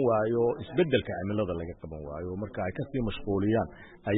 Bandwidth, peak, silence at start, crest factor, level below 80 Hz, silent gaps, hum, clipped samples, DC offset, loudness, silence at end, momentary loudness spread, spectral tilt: 4 kHz; -12 dBFS; 0 s; 16 dB; -50 dBFS; none; none; under 0.1%; under 0.1%; -30 LUFS; 0 s; 12 LU; -11 dB/octave